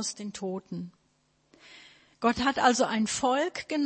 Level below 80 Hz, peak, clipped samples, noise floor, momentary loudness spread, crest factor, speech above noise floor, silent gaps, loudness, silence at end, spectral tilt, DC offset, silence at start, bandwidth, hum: -62 dBFS; -8 dBFS; under 0.1%; -70 dBFS; 15 LU; 22 dB; 42 dB; none; -28 LUFS; 0 s; -3.5 dB/octave; under 0.1%; 0 s; 8.8 kHz; none